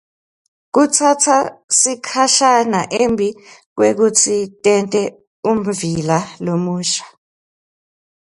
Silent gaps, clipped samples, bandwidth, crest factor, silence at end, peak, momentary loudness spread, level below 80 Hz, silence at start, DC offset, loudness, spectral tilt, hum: 1.64-1.68 s, 3.66-3.76 s, 5.27-5.43 s; under 0.1%; 11.5 kHz; 16 dB; 1.2 s; 0 dBFS; 8 LU; -56 dBFS; 0.75 s; under 0.1%; -15 LUFS; -3 dB/octave; none